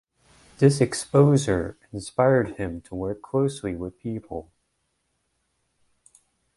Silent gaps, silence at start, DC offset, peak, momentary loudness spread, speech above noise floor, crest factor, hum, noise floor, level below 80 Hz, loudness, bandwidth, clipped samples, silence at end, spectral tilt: none; 0.6 s; under 0.1%; -4 dBFS; 15 LU; 51 dB; 22 dB; none; -74 dBFS; -50 dBFS; -24 LUFS; 11.5 kHz; under 0.1%; 2.15 s; -6.5 dB/octave